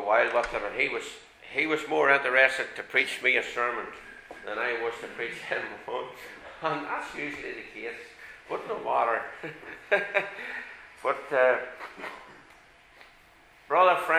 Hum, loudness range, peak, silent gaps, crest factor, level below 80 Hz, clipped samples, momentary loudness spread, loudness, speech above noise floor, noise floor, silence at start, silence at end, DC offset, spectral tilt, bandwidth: none; 9 LU; -4 dBFS; none; 24 dB; -62 dBFS; under 0.1%; 19 LU; -28 LUFS; 29 dB; -57 dBFS; 0 s; 0 s; under 0.1%; -3.5 dB/octave; 15.5 kHz